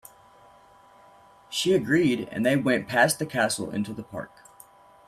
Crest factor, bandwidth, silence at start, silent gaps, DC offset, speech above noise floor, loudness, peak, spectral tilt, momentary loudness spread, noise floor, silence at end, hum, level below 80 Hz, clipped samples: 20 dB; 15.5 kHz; 1.5 s; none; under 0.1%; 30 dB; -25 LUFS; -6 dBFS; -4.5 dB/octave; 15 LU; -54 dBFS; 0.8 s; none; -64 dBFS; under 0.1%